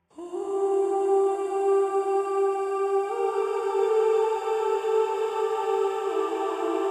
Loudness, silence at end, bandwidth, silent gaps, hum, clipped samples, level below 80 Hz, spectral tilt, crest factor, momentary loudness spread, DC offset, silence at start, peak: -25 LUFS; 0 s; 10.5 kHz; none; none; under 0.1%; -74 dBFS; -3 dB/octave; 12 dB; 4 LU; under 0.1%; 0.15 s; -14 dBFS